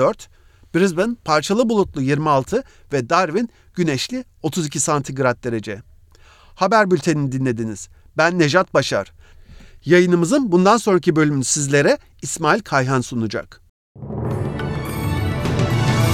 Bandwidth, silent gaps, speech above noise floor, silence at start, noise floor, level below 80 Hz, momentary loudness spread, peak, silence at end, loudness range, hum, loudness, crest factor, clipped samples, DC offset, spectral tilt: 15.5 kHz; 13.69-13.95 s; 30 dB; 0 s; -48 dBFS; -44 dBFS; 12 LU; -2 dBFS; 0 s; 5 LU; none; -19 LUFS; 18 dB; under 0.1%; under 0.1%; -5 dB/octave